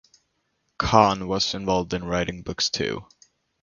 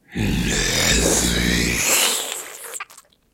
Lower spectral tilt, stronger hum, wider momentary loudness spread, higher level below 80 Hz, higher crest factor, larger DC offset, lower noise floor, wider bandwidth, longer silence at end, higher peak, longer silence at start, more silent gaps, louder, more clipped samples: first, -4 dB/octave vs -2.5 dB/octave; neither; second, 11 LU vs 16 LU; second, -46 dBFS vs -32 dBFS; about the same, 24 dB vs 20 dB; neither; first, -73 dBFS vs -49 dBFS; second, 7.4 kHz vs 16.5 kHz; first, 0.6 s vs 0.35 s; about the same, 0 dBFS vs -2 dBFS; first, 0.8 s vs 0.1 s; neither; second, -23 LUFS vs -18 LUFS; neither